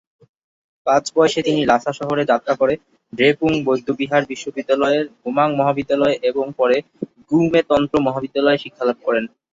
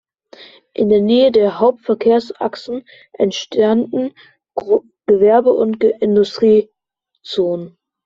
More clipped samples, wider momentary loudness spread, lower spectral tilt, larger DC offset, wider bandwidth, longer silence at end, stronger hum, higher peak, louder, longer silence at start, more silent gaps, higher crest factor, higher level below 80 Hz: neither; second, 6 LU vs 15 LU; about the same, -5.5 dB/octave vs -6.5 dB/octave; neither; about the same, 8 kHz vs 7.4 kHz; second, 0.25 s vs 0.4 s; neither; about the same, -2 dBFS vs -2 dBFS; second, -18 LUFS vs -15 LUFS; first, 0.85 s vs 0.4 s; neither; about the same, 16 dB vs 14 dB; about the same, -54 dBFS vs -56 dBFS